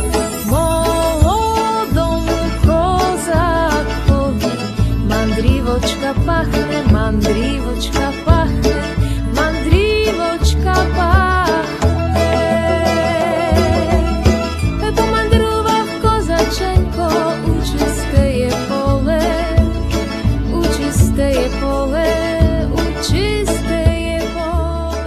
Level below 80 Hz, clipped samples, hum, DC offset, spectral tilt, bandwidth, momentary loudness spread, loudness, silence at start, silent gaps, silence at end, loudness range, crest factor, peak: -20 dBFS; under 0.1%; none; under 0.1%; -6 dB/octave; 14 kHz; 4 LU; -16 LUFS; 0 s; none; 0 s; 2 LU; 14 dB; 0 dBFS